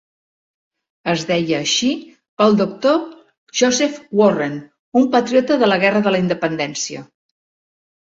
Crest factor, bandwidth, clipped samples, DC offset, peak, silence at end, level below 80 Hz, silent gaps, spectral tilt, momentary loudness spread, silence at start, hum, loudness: 16 dB; 7.8 kHz; under 0.1%; under 0.1%; -2 dBFS; 1.15 s; -60 dBFS; 2.29-2.37 s, 3.38-3.47 s, 4.79-4.92 s; -4 dB/octave; 10 LU; 1.05 s; none; -17 LUFS